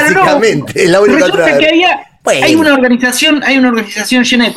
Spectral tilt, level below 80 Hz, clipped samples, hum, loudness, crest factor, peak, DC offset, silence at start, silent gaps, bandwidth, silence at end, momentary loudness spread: -3.5 dB/octave; -46 dBFS; under 0.1%; none; -8 LUFS; 8 dB; 0 dBFS; under 0.1%; 0 s; none; 16 kHz; 0 s; 4 LU